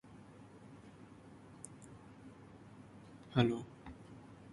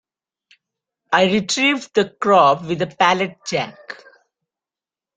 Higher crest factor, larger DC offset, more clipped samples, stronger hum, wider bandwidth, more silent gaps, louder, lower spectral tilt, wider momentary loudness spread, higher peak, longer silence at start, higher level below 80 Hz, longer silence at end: first, 26 dB vs 20 dB; neither; neither; neither; first, 11.5 kHz vs 9.4 kHz; neither; second, -38 LUFS vs -17 LUFS; first, -6.5 dB/octave vs -4 dB/octave; first, 23 LU vs 15 LU; second, -18 dBFS vs 0 dBFS; second, 0.05 s vs 1.1 s; about the same, -66 dBFS vs -62 dBFS; second, 0 s vs 1.25 s